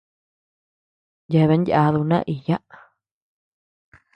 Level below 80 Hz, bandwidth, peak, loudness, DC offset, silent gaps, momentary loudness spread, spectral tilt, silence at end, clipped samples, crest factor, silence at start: -56 dBFS; 5.6 kHz; -4 dBFS; -20 LUFS; under 0.1%; none; 8 LU; -9.5 dB/octave; 1.6 s; under 0.1%; 18 dB; 1.3 s